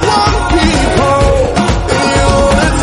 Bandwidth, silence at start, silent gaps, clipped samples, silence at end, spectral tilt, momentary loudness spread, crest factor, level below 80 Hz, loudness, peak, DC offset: 11.5 kHz; 0 s; none; under 0.1%; 0 s; -5 dB/octave; 2 LU; 10 dB; -18 dBFS; -10 LUFS; 0 dBFS; under 0.1%